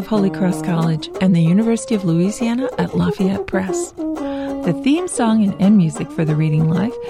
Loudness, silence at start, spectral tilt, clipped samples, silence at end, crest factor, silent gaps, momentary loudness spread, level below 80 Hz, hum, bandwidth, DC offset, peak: -18 LUFS; 0 s; -7 dB/octave; under 0.1%; 0 s; 12 dB; none; 8 LU; -46 dBFS; none; 13 kHz; under 0.1%; -4 dBFS